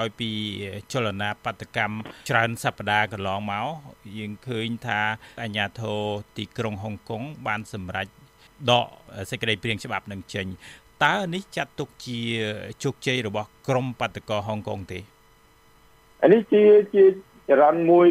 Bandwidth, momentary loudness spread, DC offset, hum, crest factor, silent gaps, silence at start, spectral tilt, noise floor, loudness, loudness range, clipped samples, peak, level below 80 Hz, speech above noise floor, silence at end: 15 kHz; 16 LU; under 0.1%; none; 20 dB; none; 0 s; -5.5 dB/octave; -56 dBFS; -24 LUFS; 8 LU; under 0.1%; -4 dBFS; -60 dBFS; 33 dB; 0 s